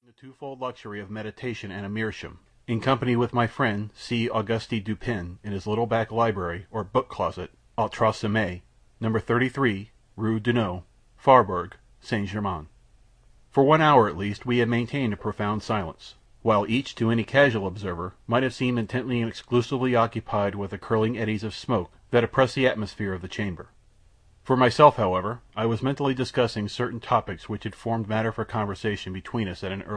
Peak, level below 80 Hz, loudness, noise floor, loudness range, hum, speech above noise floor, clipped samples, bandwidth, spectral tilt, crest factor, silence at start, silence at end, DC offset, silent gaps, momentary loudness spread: -2 dBFS; -52 dBFS; -25 LUFS; -57 dBFS; 4 LU; none; 32 dB; under 0.1%; 10 kHz; -6.5 dB/octave; 24 dB; 0.25 s; 0 s; under 0.1%; none; 14 LU